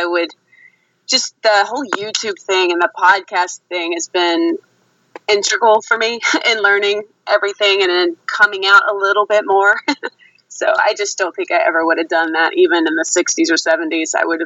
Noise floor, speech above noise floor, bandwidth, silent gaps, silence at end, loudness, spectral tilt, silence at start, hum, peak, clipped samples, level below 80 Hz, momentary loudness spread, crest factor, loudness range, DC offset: -50 dBFS; 35 dB; 8.2 kHz; none; 0 s; -15 LUFS; -0.5 dB/octave; 0 s; none; 0 dBFS; under 0.1%; -70 dBFS; 8 LU; 16 dB; 3 LU; under 0.1%